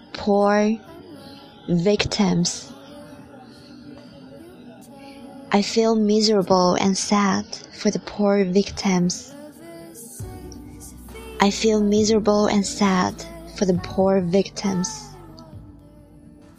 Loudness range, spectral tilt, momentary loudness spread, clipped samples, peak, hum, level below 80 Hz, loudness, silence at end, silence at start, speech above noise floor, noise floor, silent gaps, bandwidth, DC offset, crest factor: 6 LU; -5 dB/octave; 24 LU; under 0.1%; 0 dBFS; none; -48 dBFS; -20 LUFS; 0.85 s; 0.15 s; 27 dB; -46 dBFS; none; 14 kHz; under 0.1%; 22 dB